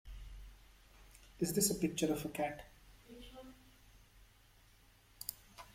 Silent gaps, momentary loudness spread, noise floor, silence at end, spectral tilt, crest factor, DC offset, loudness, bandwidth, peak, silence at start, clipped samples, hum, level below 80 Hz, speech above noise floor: none; 27 LU; -66 dBFS; 0.05 s; -4 dB/octave; 24 dB; under 0.1%; -37 LUFS; 16.5 kHz; -20 dBFS; 0.05 s; under 0.1%; none; -60 dBFS; 29 dB